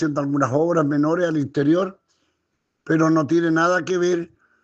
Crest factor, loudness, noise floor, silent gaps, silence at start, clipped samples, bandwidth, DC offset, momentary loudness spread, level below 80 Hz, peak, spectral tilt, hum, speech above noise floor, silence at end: 16 dB; -20 LUFS; -74 dBFS; none; 0 s; under 0.1%; 7.8 kHz; under 0.1%; 5 LU; -66 dBFS; -6 dBFS; -6.5 dB/octave; none; 55 dB; 0.4 s